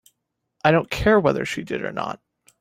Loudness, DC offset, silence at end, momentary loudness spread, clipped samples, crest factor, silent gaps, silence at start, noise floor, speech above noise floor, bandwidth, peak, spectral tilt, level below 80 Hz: -21 LUFS; under 0.1%; 0.45 s; 13 LU; under 0.1%; 20 dB; none; 0.65 s; -77 dBFS; 56 dB; 16 kHz; -2 dBFS; -6 dB/octave; -44 dBFS